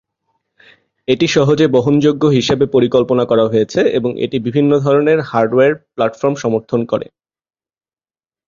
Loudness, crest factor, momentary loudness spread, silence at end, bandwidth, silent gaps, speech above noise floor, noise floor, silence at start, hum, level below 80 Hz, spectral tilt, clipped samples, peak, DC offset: -14 LUFS; 14 dB; 7 LU; 1.45 s; 7.4 kHz; none; over 77 dB; under -90 dBFS; 1.1 s; none; -52 dBFS; -6.5 dB/octave; under 0.1%; 0 dBFS; under 0.1%